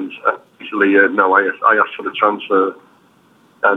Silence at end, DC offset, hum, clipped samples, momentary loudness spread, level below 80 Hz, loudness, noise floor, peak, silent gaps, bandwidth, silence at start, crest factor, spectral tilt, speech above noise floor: 0 s; under 0.1%; none; under 0.1%; 9 LU; -66 dBFS; -15 LUFS; -52 dBFS; 0 dBFS; none; 4.1 kHz; 0 s; 16 dB; -6.5 dB/octave; 37 dB